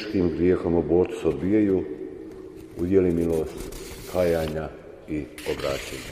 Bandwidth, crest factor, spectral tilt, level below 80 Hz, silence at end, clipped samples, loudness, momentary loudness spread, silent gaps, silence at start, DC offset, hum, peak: 15.5 kHz; 18 dB; -7 dB/octave; -44 dBFS; 0 s; under 0.1%; -25 LUFS; 16 LU; none; 0 s; under 0.1%; none; -8 dBFS